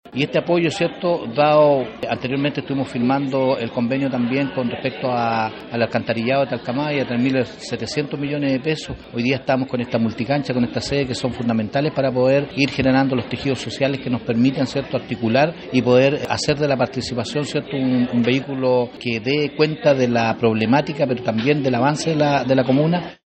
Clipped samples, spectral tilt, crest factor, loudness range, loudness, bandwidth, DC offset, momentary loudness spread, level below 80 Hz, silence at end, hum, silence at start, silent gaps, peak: under 0.1%; -6 dB/octave; 16 dB; 3 LU; -20 LUFS; 8.8 kHz; under 0.1%; 7 LU; -50 dBFS; 0.2 s; none; 0.05 s; none; -2 dBFS